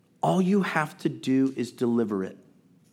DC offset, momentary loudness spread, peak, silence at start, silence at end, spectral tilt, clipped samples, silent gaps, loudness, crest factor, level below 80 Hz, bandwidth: under 0.1%; 7 LU; -8 dBFS; 0.25 s; 0.55 s; -7 dB/octave; under 0.1%; none; -26 LUFS; 18 dB; -78 dBFS; 16 kHz